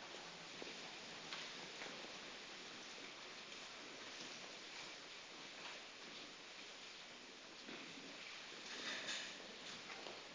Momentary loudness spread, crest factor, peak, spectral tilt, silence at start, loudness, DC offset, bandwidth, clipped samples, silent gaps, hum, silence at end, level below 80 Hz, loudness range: 7 LU; 20 dB; -32 dBFS; -1 dB/octave; 0 s; -51 LUFS; under 0.1%; 8 kHz; under 0.1%; none; none; 0 s; -86 dBFS; 3 LU